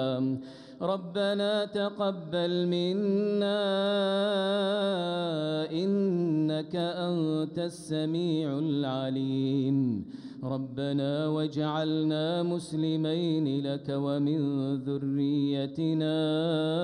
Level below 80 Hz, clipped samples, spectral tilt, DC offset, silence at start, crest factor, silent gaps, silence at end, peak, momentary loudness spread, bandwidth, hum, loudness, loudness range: -74 dBFS; under 0.1%; -7 dB/octave; under 0.1%; 0 s; 12 dB; none; 0 s; -16 dBFS; 5 LU; 11 kHz; none; -29 LUFS; 2 LU